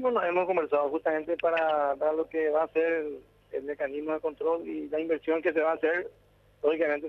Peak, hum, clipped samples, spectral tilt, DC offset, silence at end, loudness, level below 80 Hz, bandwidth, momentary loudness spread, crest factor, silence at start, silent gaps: -12 dBFS; 50 Hz at -70 dBFS; under 0.1%; -7 dB/octave; under 0.1%; 0 s; -29 LUFS; -68 dBFS; 5.6 kHz; 7 LU; 16 dB; 0 s; none